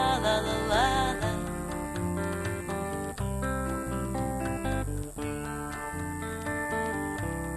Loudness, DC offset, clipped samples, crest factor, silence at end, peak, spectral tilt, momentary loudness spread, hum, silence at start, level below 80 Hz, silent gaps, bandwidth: -31 LUFS; under 0.1%; under 0.1%; 18 dB; 0 s; -12 dBFS; -5 dB/octave; 9 LU; none; 0 s; -40 dBFS; none; 13.5 kHz